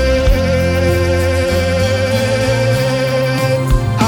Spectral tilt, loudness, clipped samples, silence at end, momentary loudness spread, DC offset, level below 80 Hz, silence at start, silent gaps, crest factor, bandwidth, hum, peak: -6 dB/octave; -14 LUFS; under 0.1%; 0 s; 1 LU; under 0.1%; -22 dBFS; 0 s; none; 12 dB; 19 kHz; none; -2 dBFS